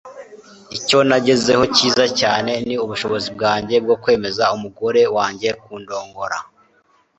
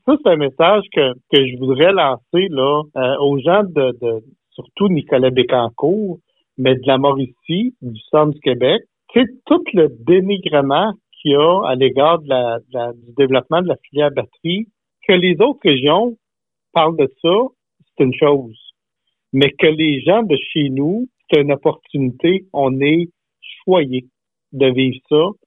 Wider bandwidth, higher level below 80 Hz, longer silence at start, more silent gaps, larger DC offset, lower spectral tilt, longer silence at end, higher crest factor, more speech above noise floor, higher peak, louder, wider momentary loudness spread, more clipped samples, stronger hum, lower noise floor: first, 8.2 kHz vs 4 kHz; first, -52 dBFS vs -60 dBFS; about the same, 0.05 s vs 0.05 s; neither; neither; second, -3.5 dB/octave vs -9 dB/octave; first, 0.75 s vs 0.15 s; about the same, 18 dB vs 16 dB; second, 41 dB vs 70 dB; about the same, 0 dBFS vs 0 dBFS; about the same, -17 LUFS vs -16 LUFS; first, 14 LU vs 9 LU; neither; neither; second, -58 dBFS vs -85 dBFS